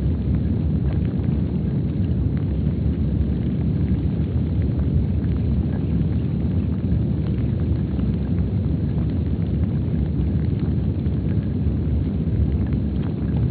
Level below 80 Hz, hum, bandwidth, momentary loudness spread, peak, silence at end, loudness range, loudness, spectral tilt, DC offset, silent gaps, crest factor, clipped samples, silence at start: -28 dBFS; none; 4.5 kHz; 1 LU; -8 dBFS; 0 s; 1 LU; -22 LUFS; -10.5 dB/octave; under 0.1%; none; 12 dB; under 0.1%; 0 s